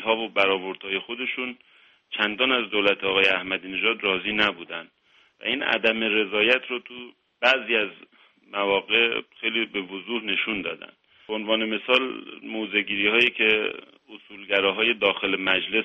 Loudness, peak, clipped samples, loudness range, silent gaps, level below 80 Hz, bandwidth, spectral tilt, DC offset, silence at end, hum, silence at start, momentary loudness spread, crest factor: -23 LUFS; -4 dBFS; under 0.1%; 3 LU; none; -62 dBFS; 8.2 kHz; -4.5 dB/octave; under 0.1%; 0 s; none; 0 s; 13 LU; 20 dB